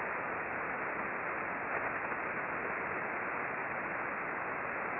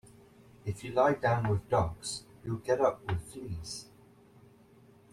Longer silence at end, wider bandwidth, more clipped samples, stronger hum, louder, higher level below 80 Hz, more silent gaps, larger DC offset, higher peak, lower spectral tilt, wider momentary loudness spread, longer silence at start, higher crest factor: second, 0 s vs 1.3 s; second, 4.7 kHz vs 14 kHz; neither; neither; second, -36 LUFS vs -32 LUFS; second, -68 dBFS vs -56 dBFS; neither; neither; second, -24 dBFS vs -14 dBFS; about the same, -4.5 dB/octave vs -5.5 dB/octave; second, 1 LU vs 14 LU; second, 0 s vs 0.65 s; second, 14 dB vs 20 dB